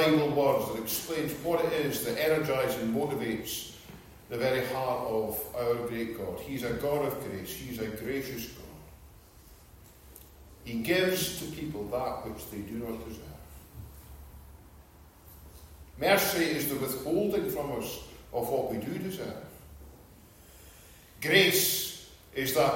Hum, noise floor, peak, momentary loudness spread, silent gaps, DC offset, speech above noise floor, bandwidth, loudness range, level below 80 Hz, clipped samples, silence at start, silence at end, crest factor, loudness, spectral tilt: none; -54 dBFS; -10 dBFS; 25 LU; none; under 0.1%; 24 dB; 16.5 kHz; 11 LU; -56 dBFS; under 0.1%; 0 s; 0 s; 22 dB; -30 LUFS; -4 dB/octave